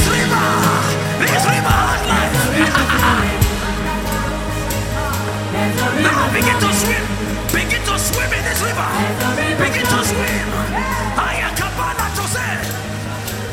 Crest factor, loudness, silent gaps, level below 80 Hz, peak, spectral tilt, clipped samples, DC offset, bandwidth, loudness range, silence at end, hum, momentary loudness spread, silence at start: 16 dB; -17 LUFS; none; -28 dBFS; -2 dBFS; -4 dB/octave; under 0.1%; under 0.1%; 17 kHz; 3 LU; 0 s; none; 7 LU; 0 s